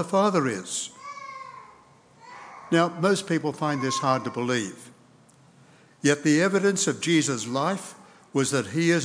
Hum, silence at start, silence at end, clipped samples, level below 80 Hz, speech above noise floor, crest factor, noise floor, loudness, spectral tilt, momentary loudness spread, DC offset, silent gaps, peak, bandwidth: none; 0 s; 0 s; under 0.1%; -78 dBFS; 32 dB; 20 dB; -56 dBFS; -25 LUFS; -4.5 dB/octave; 18 LU; under 0.1%; none; -6 dBFS; 10.5 kHz